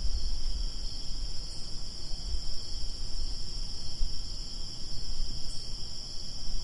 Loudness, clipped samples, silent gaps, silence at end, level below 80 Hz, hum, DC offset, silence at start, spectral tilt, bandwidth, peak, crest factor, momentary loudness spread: -38 LUFS; under 0.1%; none; 0 s; -34 dBFS; none; under 0.1%; 0 s; -3 dB/octave; 11 kHz; -14 dBFS; 14 dB; 2 LU